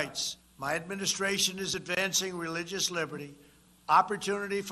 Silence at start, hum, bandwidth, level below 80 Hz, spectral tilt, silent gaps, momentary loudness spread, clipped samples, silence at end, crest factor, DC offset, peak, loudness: 0 s; none; 13 kHz; -66 dBFS; -2 dB/octave; none; 12 LU; under 0.1%; 0 s; 22 dB; under 0.1%; -10 dBFS; -30 LUFS